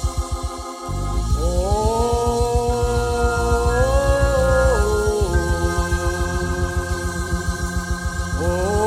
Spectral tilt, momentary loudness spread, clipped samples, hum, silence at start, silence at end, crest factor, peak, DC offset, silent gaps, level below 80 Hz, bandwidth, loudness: -5.5 dB/octave; 8 LU; under 0.1%; none; 0 s; 0 s; 14 dB; -6 dBFS; under 0.1%; none; -24 dBFS; 15.5 kHz; -21 LUFS